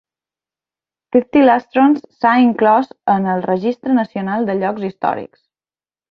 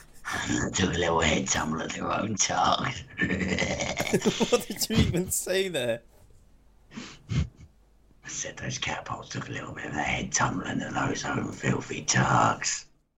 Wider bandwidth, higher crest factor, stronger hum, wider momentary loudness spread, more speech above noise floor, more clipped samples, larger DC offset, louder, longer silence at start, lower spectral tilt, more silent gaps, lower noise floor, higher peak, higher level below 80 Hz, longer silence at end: second, 5.4 kHz vs 16 kHz; about the same, 16 dB vs 20 dB; neither; second, 8 LU vs 11 LU; first, over 75 dB vs 31 dB; neither; neither; first, -16 LUFS vs -28 LUFS; first, 1.15 s vs 0 s; first, -8.5 dB/octave vs -3.5 dB/octave; neither; first, under -90 dBFS vs -59 dBFS; first, -2 dBFS vs -8 dBFS; second, -60 dBFS vs -46 dBFS; first, 0.85 s vs 0.35 s